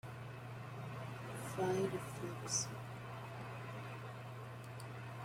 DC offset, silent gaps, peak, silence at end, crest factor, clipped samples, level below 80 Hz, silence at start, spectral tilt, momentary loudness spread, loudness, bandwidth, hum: under 0.1%; none; -24 dBFS; 0 s; 20 dB; under 0.1%; -70 dBFS; 0.05 s; -4.5 dB/octave; 11 LU; -44 LUFS; 16 kHz; none